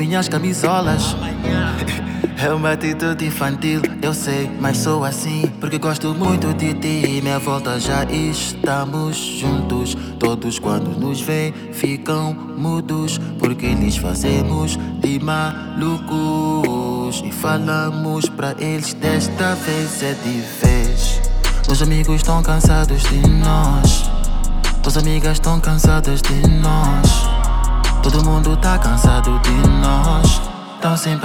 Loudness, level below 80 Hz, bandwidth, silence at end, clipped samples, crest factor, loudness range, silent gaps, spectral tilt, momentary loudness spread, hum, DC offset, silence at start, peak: -18 LUFS; -20 dBFS; 18.5 kHz; 0 s; under 0.1%; 14 dB; 4 LU; none; -5 dB/octave; 7 LU; none; under 0.1%; 0 s; -2 dBFS